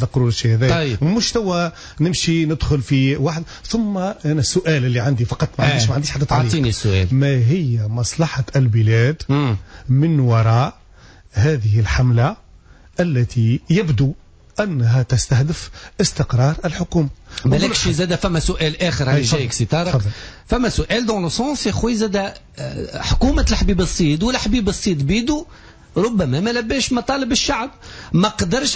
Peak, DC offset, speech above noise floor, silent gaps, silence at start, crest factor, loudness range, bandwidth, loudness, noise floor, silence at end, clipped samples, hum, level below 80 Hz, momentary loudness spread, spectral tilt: -6 dBFS; under 0.1%; 28 dB; none; 0 s; 12 dB; 2 LU; 8 kHz; -18 LUFS; -45 dBFS; 0 s; under 0.1%; none; -30 dBFS; 7 LU; -5.5 dB/octave